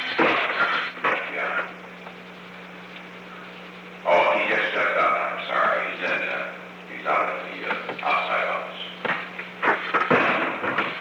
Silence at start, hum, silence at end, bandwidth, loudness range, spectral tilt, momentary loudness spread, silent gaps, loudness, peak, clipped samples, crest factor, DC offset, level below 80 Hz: 0 s; 60 Hz at -50 dBFS; 0 s; 19.5 kHz; 5 LU; -5 dB/octave; 19 LU; none; -23 LUFS; -8 dBFS; under 0.1%; 18 dB; under 0.1%; -70 dBFS